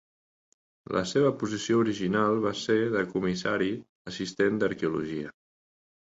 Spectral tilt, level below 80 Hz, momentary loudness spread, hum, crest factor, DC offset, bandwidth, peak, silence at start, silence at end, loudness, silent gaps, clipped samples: -5.5 dB/octave; -62 dBFS; 10 LU; none; 16 dB; under 0.1%; 8 kHz; -12 dBFS; 0.9 s; 0.85 s; -28 LUFS; 3.89-4.05 s; under 0.1%